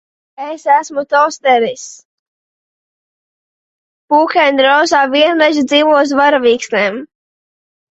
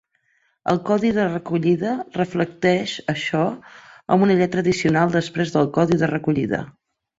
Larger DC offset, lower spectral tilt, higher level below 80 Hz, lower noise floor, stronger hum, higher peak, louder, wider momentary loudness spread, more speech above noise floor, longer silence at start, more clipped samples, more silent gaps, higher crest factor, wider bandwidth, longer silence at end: neither; second, -2.5 dB/octave vs -6.5 dB/octave; about the same, -60 dBFS vs -56 dBFS; first, under -90 dBFS vs -65 dBFS; neither; first, 0 dBFS vs -4 dBFS; first, -12 LUFS vs -21 LUFS; first, 12 LU vs 7 LU; first, over 78 dB vs 45 dB; second, 0.4 s vs 0.65 s; neither; first, 2.05-4.08 s vs none; about the same, 14 dB vs 18 dB; about the same, 8.2 kHz vs 8 kHz; first, 0.9 s vs 0.5 s